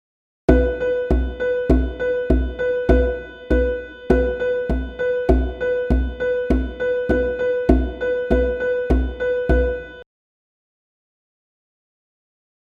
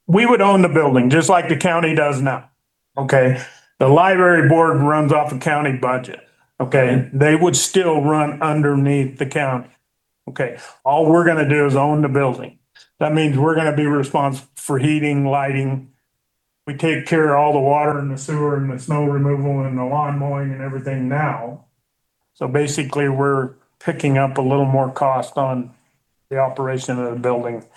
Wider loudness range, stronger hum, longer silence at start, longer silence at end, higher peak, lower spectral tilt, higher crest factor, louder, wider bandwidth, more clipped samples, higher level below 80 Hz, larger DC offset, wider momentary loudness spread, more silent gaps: about the same, 5 LU vs 6 LU; neither; first, 0.5 s vs 0.1 s; first, 2.7 s vs 0.15 s; about the same, 0 dBFS vs 0 dBFS; first, -9 dB/octave vs -6 dB/octave; about the same, 20 dB vs 16 dB; second, -21 LUFS vs -17 LUFS; second, 4.9 kHz vs 12.5 kHz; neither; first, -24 dBFS vs -62 dBFS; neither; second, 5 LU vs 12 LU; neither